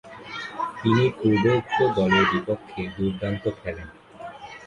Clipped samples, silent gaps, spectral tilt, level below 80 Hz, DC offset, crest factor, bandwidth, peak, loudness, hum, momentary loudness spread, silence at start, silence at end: under 0.1%; none; -7 dB/octave; -50 dBFS; under 0.1%; 18 dB; 10.5 kHz; -6 dBFS; -23 LUFS; none; 19 LU; 0.05 s; 0 s